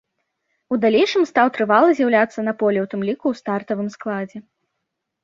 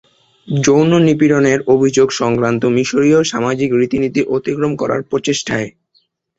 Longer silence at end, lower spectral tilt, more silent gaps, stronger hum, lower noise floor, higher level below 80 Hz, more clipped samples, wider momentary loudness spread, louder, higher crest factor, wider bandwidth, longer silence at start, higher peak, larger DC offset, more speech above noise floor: first, 0.85 s vs 0.7 s; about the same, -6 dB/octave vs -5.5 dB/octave; neither; neither; first, -78 dBFS vs -60 dBFS; second, -66 dBFS vs -50 dBFS; neither; first, 11 LU vs 7 LU; second, -19 LUFS vs -14 LUFS; about the same, 18 dB vs 14 dB; about the same, 7.6 kHz vs 8.2 kHz; first, 0.7 s vs 0.45 s; about the same, -2 dBFS vs 0 dBFS; neither; first, 60 dB vs 47 dB